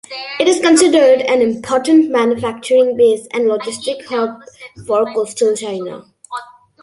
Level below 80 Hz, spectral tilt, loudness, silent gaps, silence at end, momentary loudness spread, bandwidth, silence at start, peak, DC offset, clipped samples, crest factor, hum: -58 dBFS; -3.5 dB/octave; -14 LUFS; none; 0.4 s; 19 LU; 11.5 kHz; 0.1 s; 0 dBFS; under 0.1%; under 0.1%; 14 dB; none